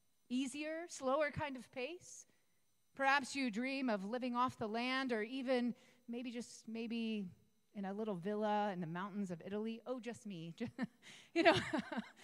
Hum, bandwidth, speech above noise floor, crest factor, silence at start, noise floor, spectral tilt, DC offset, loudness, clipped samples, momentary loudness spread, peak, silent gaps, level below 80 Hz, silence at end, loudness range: none; 13 kHz; 42 dB; 26 dB; 0.3 s; -82 dBFS; -4.5 dB/octave; under 0.1%; -40 LUFS; under 0.1%; 14 LU; -14 dBFS; none; -76 dBFS; 0 s; 4 LU